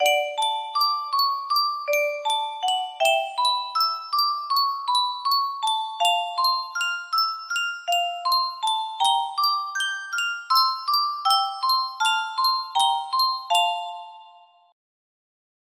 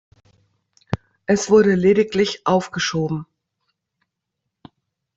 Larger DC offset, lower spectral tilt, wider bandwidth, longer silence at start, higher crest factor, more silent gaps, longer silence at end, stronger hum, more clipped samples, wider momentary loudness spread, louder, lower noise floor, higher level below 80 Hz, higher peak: neither; second, 3.5 dB/octave vs -5 dB/octave; first, 15.5 kHz vs 8 kHz; second, 0 s vs 0.9 s; about the same, 16 dB vs 18 dB; neither; second, 1.4 s vs 1.95 s; neither; neither; second, 4 LU vs 15 LU; second, -23 LUFS vs -19 LUFS; second, -52 dBFS vs -80 dBFS; second, -80 dBFS vs -54 dBFS; second, -8 dBFS vs -4 dBFS